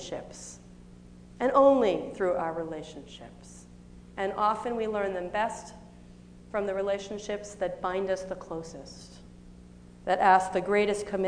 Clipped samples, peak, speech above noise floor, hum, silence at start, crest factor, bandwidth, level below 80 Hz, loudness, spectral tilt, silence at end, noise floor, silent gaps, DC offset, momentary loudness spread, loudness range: under 0.1%; -8 dBFS; 22 dB; 60 Hz at -50 dBFS; 0 s; 22 dB; 10 kHz; -56 dBFS; -28 LUFS; -5 dB/octave; 0 s; -50 dBFS; none; under 0.1%; 24 LU; 5 LU